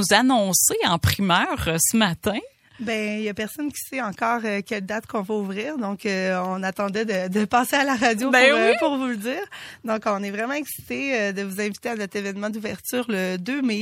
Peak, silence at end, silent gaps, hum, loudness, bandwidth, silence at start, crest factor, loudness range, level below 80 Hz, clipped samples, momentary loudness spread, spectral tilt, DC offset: 0 dBFS; 0 s; none; none; -23 LUFS; 16.5 kHz; 0 s; 22 dB; 6 LU; -50 dBFS; under 0.1%; 11 LU; -3.5 dB/octave; under 0.1%